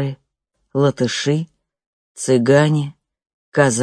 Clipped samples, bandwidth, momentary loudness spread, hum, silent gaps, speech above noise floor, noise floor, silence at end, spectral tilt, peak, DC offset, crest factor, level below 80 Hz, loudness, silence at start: under 0.1%; 10.5 kHz; 15 LU; none; 1.86-2.15 s, 3.33-3.52 s; 56 dB; -72 dBFS; 0 s; -5.5 dB/octave; 0 dBFS; under 0.1%; 18 dB; -60 dBFS; -18 LUFS; 0 s